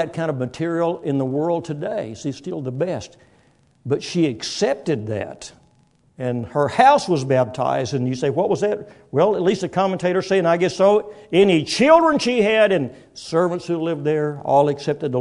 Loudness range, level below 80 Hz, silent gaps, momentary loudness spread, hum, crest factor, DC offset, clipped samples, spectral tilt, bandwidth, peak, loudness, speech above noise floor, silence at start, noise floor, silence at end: 8 LU; -60 dBFS; none; 13 LU; none; 20 dB; under 0.1%; under 0.1%; -6 dB/octave; 11 kHz; 0 dBFS; -20 LUFS; 39 dB; 0 s; -58 dBFS; 0 s